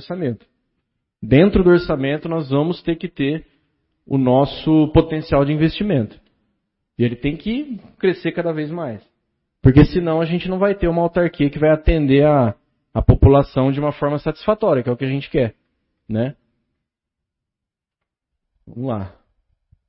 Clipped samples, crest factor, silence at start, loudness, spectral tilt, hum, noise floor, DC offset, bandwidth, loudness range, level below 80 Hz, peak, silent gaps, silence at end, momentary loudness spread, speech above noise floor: under 0.1%; 18 dB; 0 s; -18 LUFS; -12.5 dB/octave; none; -85 dBFS; under 0.1%; 5.8 kHz; 11 LU; -32 dBFS; 0 dBFS; none; 0.8 s; 13 LU; 68 dB